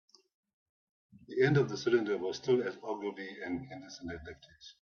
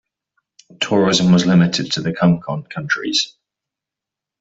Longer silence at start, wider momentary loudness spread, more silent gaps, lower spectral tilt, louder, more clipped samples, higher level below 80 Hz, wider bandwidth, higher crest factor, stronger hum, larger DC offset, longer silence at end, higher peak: first, 1.3 s vs 0.8 s; first, 18 LU vs 12 LU; neither; first, -6.5 dB/octave vs -5 dB/octave; second, -33 LUFS vs -17 LUFS; neither; second, -66 dBFS vs -54 dBFS; second, 7 kHz vs 8 kHz; first, 22 dB vs 16 dB; neither; neither; second, 0.1 s vs 1.15 s; second, -14 dBFS vs -2 dBFS